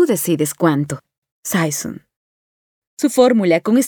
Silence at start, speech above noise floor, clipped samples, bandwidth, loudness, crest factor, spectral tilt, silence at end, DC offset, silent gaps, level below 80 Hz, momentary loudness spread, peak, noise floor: 0 s; over 74 dB; under 0.1%; over 20 kHz; -17 LUFS; 18 dB; -5 dB/octave; 0 s; under 0.1%; 1.18-1.22 s, 1.32-1.43 s, 2.16-2.97 s; -62 dBFS; 17 LU; 0 dBFS; under -90 dBFS